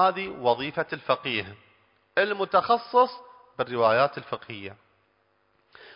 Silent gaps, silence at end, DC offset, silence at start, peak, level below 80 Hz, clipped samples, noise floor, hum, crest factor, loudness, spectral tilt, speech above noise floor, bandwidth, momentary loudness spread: none; 1.2 s; under 0.1%; 0 s; -8 dBFS; -66 dBFS; under 0.1%; -68 dBFS; none; 20 dB; -25 LUFS; -8.5 dB/octave; 43 dB; 5.4 kHz; 17 LU